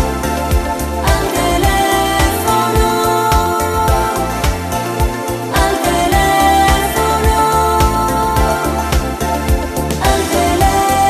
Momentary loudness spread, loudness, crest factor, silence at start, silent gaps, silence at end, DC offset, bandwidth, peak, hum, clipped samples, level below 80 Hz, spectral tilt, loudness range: 6 LU; -14 LUFS; 14 dB; 0 s; none; 0 s; under 0.1%; 14 kHz; 0 dBFS; none; under 0.1%; -20 dBFS; -4.5 dB/octave; 2 LU